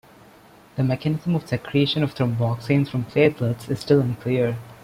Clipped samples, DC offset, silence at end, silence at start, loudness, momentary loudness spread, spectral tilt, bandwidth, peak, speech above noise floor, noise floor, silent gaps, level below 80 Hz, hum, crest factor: under 0.1%; under 0.1%; 0.1 s; 0.75 s; -22 LUFS; 6 LU; -7.5 dB/octave; 15.5 kHz; -4 dBFS; 28 dB; -50 dBFS; none; -54 dBFS; none; 18 dB